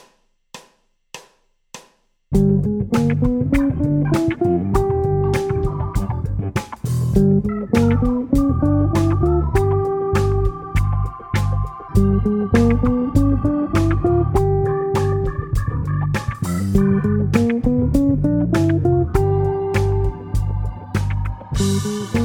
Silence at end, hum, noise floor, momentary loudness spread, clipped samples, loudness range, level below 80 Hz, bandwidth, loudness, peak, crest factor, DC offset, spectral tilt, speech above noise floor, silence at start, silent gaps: 0 s; none; -59 dBFS; 7 LU; under 0.1%; 3 LU; -28 dBFS; 17 kHz; -19 LUFS; 0 dBFS; 18 dB; under 0.1%; -8 dB/octave; 42 dB; 0.55 s; none